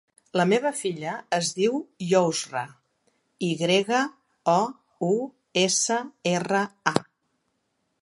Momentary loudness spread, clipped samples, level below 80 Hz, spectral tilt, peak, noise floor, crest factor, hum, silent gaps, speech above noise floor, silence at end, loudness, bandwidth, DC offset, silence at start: 9 LU; under 0.1%; -72 dBFS; -3.5 dB/octave; 0 dBFS; -75 dBFS; 26 dB; none; none; 50 dB; 1 s; -25 LUFS; 11.5 kHz; under 0.1%; 0.35 s